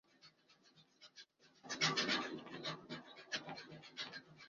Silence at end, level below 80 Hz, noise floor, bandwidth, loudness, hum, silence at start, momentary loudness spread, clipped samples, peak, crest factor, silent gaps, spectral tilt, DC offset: 0 s; -84 dBFS; -71 dBFS; 7.4 kHz; -42 LUFS; none; 0.25 s; 24 LU; under 0.1%; -20 dBFS; 26 dB; none; -1 dB/octave; under 0.1%